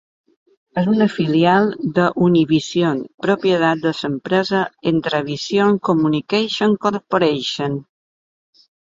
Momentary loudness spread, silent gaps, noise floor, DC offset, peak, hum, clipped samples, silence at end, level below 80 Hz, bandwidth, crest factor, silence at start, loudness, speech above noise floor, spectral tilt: 7 LU; 3.14-3.18 s; under -90 dBFS; under 0.1%; -2 dBFS; none; under 0.1%; 1 s; -60 dBFS; 7.8 kHz; 16 dB; 0.75 s; -18 LUFS; over 73 dB; -6 dB/octave